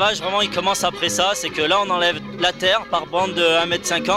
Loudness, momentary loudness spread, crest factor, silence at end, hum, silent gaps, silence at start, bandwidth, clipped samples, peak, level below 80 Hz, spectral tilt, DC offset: -19 LUFS; 4 LU; 16 dB; 0 s; none; none; 0 s; 16 kHz; under 0.1%; -4 dBFS; -52 dBFS; -2 dB/octave; under 0.1%